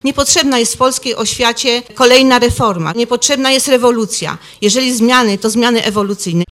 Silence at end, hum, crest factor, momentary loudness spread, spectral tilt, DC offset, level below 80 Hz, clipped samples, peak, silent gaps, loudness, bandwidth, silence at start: 0.05 s; none; 12 dB; 8 LU; -3 dB/octave; under 0.1%; -38 dBFS; 0.1%; 0 dBFS; none; -11 LUFS; over 20 kHz; 0.05 s